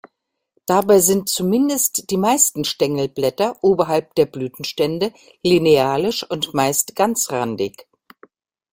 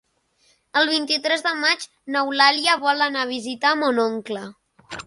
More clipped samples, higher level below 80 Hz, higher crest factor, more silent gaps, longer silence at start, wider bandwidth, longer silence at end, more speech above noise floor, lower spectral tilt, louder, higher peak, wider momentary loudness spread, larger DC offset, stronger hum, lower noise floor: neither; first, -56 dBFS vs -68 dBFS; about the same, 18 dB vs 20 dB; neither; about the same, 0.7 s vs 0.75 s; first, 16.5 kHz vs 11.5 kHz; first, 0.9 s vs 0.05 s; first, 55 dB vs 42 dB; first, -3.5 dB/octave vs -2 dB/octave; about the same, -18 LUFS vs -20 LUFS; about the same, 0 dBFS vs -2 dBFS; second, 10 LU vs 13 LU; neither; neither; first, -73 dBFS vs -63 dBFS